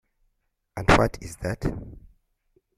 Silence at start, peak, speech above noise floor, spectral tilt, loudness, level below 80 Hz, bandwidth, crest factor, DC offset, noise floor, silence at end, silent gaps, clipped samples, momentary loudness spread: 0.75 s; -2 dBFS; 50 dB; -5.5 dB/octave; -24 LUFS; -36 dBFS; 15 kHz; 26 dB; under 0.1%; -74 dBFS; 0.8 s; none; under 0.1%; 20 LU